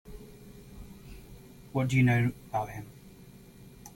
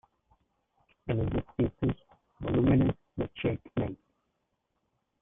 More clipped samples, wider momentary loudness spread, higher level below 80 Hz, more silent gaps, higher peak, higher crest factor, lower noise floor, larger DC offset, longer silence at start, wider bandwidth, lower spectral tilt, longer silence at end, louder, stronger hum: neither; first, 27 LU vs 15 LU; second, -54 dBFS vs -48 dBFS; neither; about the same, -14 dBFS vs -16 dBFS; about the same, 18 dB vs 16 dB; second, -52 dBFS vs -80 dBFS; neither; second, 0.05 s vs 1.05 s; first, 17 kHz vs 3.8 kHz; second, -7 dB/octave vs -11.5 dB/octave; second, 0.05 s vs 1.25 s; about the same, -29 LUFS vs -31 LUFS; neither